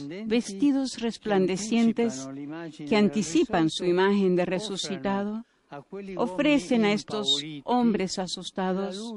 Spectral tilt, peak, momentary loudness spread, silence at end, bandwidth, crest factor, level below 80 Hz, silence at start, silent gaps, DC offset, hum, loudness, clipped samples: -5 dB/octave; -10 dBFS; 14 LU; 0 s; 11.5 kHz; 16 dB; -60 dBFS; 0 s; none; under 0.1%; none; -26 LUFS; under 0.1%